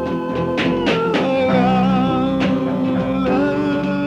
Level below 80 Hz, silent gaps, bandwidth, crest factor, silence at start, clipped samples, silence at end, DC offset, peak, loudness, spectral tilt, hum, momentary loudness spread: -42 dBFS; none; 8.2 kHz; 12 dB; 0 s; under 0.1%; 0 s; under 0.1%; -6 dBFS; -18 LUFS; -7.5 dB/octave; none; 4 LU